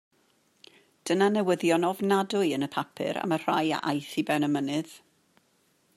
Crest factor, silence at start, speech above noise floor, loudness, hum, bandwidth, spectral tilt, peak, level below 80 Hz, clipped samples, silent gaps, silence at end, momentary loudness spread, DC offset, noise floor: 18 dB; 1.05 s; 42 dB; -27 LUFS; none; 15 kHz; -5.5 dB/octave; -10 dBFS; -76 dBFS; under 0.1%; none; 1 s; 8 LU; under 0.1%; -68 dBFS